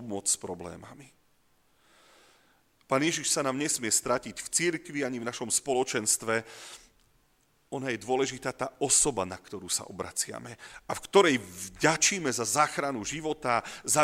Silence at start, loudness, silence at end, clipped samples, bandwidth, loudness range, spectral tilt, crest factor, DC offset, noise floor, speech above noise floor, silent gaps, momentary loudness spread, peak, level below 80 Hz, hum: 0 s; -28 LUFS; 0 s; under 0.1%; 16.5 kHz; 5 LU; -2.5 dB/octave; 24 dB; under 0.1%; -68 dBFS; 38 dB; none; 17 LU; -8 dBFS; -62 dBFS; none